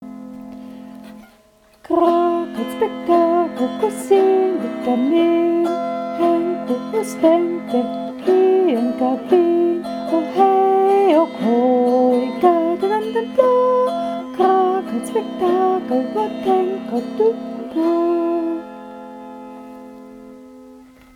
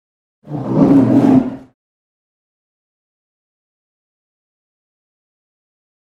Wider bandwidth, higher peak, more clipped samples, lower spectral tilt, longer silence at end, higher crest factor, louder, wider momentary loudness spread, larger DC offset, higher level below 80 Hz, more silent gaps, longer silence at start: first, 13 kHz vs 6.2 kHz; about the same, 0 dBFS vs 0 dBFS; neither; second, -6 dB/octave vs -10 dB/octave; second, 0.35 s vs 4.5 s; about the same, 18 dB vs 18 dB; second, -18 LUFS vs -12 LUFS; first, 20 LU vs 16 LU; neither; second, -62 dBFS vs -52 dBFS; neither; second, 0 s vs 0.45 s